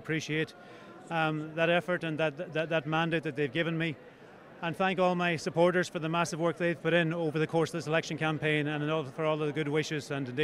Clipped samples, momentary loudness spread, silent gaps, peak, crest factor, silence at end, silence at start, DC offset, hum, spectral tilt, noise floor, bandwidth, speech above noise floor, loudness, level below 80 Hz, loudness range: under 0.1%; 7 LU; none; -12 dBFS; 18 dB; 0 s; 0 s; under 0.1%; none; -5.5 dB/octave; -52 dBFS; 13 kHz; 22 dB; -30 LUFS; -68 dBFS; 2 LU